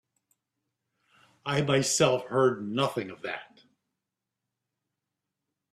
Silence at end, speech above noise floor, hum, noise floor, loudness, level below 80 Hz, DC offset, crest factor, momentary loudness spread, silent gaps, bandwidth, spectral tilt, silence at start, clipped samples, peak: 2.3 s; 60 dB; none; -87 dBFS; -27 LUFS; -68 dBFS; under 0.1%; 22 dB; 13 LU; none; 14 kHz; -4 dB/octave; 1.45 s; under 0.1%; -10 dBFS